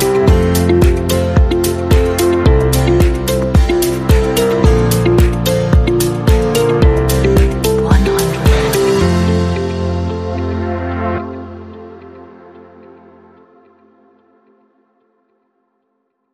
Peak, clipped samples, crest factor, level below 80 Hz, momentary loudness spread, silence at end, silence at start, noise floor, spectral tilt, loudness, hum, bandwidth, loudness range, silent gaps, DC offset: 0 dBFS; under 0.1%; 14 dB; -18 dBFS; 8 LU; 3.7 s; 0 s; -66 dBFS; -6 dB/octave; -13 LUFS; none; 15.5 kHz; 11 LU; none; under 0.1%